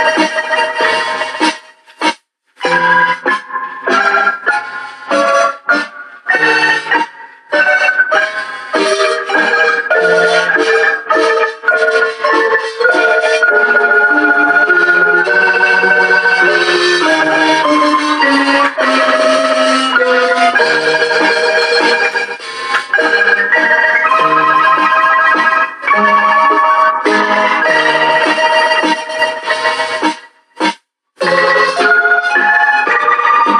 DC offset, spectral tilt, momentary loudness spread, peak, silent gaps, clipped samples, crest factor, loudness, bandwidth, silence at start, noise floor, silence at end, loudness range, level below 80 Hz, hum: under 0.1%; -2.5 dB/octave; 8 LU; 0 dBFS; none; under 0.1%; 12 dB; -10 LUFS; 11 kHz; 0 s; -38 dBFS; 0 s; 4 LU; -72 dBFS; none